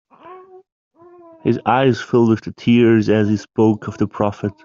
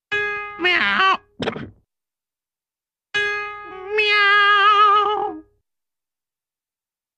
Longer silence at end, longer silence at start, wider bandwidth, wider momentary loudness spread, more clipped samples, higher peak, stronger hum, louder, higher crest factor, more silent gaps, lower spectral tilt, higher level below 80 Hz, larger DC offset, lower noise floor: second, 0.15 s vs 1.75 s; first, 0.25 s vs 0.1 s; second, 7.2 kHz vs 9.2 kHz; second, 8 LU vs 15 LU; neither; first, 0 dBFS vs -4 dBFS; neither; about the same, -17 LUFS vs -17 LUFS; about the same, 16 dB vs 16 dB; first, 0.72-0.91 s vs none; first, -7.5 dB/octave vs -3 dB/octave; about the same, -56 dBFS vs -60 dBFS; neither; second, -44 dBFS vs under -90 dBFS